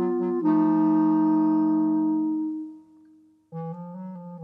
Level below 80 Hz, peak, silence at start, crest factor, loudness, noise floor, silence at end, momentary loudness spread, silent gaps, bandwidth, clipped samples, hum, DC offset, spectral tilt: -84 dBFS; -10 dBFS; 0 s; 14 dB; -23 LUFS; -56 dBFS; 0 s; 17 LU; none; 2.8 kHz; under 0.1%; none; under 0.1%; -11.5 dB/octave